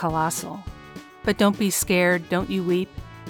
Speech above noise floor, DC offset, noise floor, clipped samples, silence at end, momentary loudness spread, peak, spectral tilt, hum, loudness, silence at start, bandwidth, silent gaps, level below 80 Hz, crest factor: 20 dB; under 0.1%; -42 dBFS; under 0.1%; 0 s; 18 LU; -4 dBFS; -4.5 dB/octave; none; -23 LUFS; 0 s; over 20 kHz; none; -46 dBFS; 20 dB